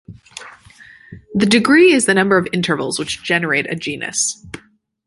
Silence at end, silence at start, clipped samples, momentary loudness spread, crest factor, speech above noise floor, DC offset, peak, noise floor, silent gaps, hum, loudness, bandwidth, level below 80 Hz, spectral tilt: 0.5 s; 0.1 s; under 0.1%; 24 LU; 16 dB; 35 dB; under 0.1%; 0 dBFS; -51 dBFS; none; none; -15 LUFS; 11.5 kHz; -54 dBFS; -3.5 dB/octave